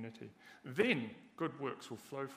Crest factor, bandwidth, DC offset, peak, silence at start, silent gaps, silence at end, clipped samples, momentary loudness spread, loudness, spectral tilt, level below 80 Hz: 22 dB; 15.5 kHz; under 0.1%; -18 dBFS; 0 s; none; 0 s; under 0.1%; 20 LU; -39 LUFS; -5.5 dB/octave; -84 dBFS